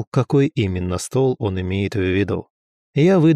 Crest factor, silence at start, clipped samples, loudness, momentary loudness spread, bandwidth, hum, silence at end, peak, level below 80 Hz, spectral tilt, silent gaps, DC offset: 12 dB; 0 s; under 0.1%; -20 LUFS; 7 LU; 14 kHz; none; 0 s; -6 dBFS; -48 dBFS; -7 dB/octave; 0.07-0.12 s, 2.50-2.93 s; under 0.1%